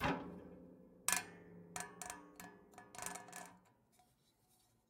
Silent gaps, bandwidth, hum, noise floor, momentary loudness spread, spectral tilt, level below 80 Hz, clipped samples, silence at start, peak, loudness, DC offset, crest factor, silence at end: none; 17 kHz; none; -76 dBFS; 21 LU; -2.5 dB/octave; -70 dBFS; under 0.1%; 0 s; -18 dBFS; -45 LUFS; under 0.1%; 30 dB; 0.9 s